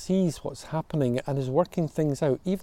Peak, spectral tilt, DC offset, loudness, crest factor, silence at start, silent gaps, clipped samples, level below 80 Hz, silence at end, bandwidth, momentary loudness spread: -10 dBFS; -7.5 dB/octave; under 0.1%; -28 LUFS; 16 dB; 0 s; none; under 0.1%; -54 dBFS; 0 s; 15 kHz; 6 LU